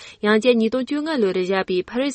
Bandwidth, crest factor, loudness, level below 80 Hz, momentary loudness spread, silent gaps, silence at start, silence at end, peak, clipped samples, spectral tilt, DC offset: 8.8 kHz; 16 dB; -20 LUFS; -58 dBFS; 7 LU; none; 0 s; 0 s; -4 dBFS; under 0.1%; -5.5 dB/octave; under 0.1%